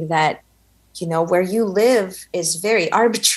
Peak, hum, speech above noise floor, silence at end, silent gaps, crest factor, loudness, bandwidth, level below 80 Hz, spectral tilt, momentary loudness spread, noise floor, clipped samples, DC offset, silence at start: -2 dBFS; none; 39 dB; 0 s; none; 16 dB; -18 LUFS; 13.5 kHz; -60 dBFS; -3 dB/octave; 9 LU; -57 dBFS; under 0.1%; under 0.1%; 0 s